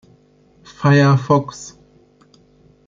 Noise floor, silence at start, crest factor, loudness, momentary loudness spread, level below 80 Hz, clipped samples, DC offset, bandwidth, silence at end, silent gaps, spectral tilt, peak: -53 dBFS; 0.8 s; 16 dB; -15 LUFS; 22 LU; -56 dBFS; under 0.1%; under 0.1%; 7.6 kHz; 1.2 s; none; -7 dB/octave; -2 dBFS